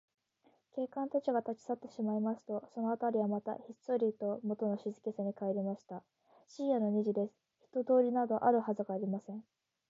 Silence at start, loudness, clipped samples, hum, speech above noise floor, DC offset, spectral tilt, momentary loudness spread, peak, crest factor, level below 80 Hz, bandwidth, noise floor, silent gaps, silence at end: 0.75 s; -36 LUFS; under 0.1%; none; 38 dB; under 0.1%; -8 dB/octave; 12 LU; -16 dBFS; 20 dB; -88 dBFS; 7.6 kHz; -73 dBFS; none; 0.5 s